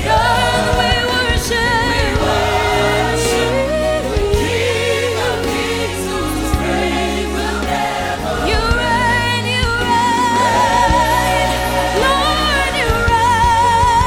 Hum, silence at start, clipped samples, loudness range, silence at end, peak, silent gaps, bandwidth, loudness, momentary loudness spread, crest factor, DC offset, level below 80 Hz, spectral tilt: none; 0 s; under 0.1%; 4 LU; 0 s; -2 dBFS; none; 17.5 kHz; -15 LUFS; 6 LU; 14 dB; under 0.1%; -26 dBFS; -4 dB/octave